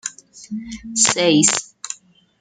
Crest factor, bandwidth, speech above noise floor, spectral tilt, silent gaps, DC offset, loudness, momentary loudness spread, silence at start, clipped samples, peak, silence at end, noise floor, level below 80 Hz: 20 dB; 10 kHz; 20 dB; -2 dB/octave; none; under 0.1%; -16 LUFS; 18 LU; 0.05 s; under 0.1%; 0 dBFS; 0.45 s; -37 dBFS; -56 dBFS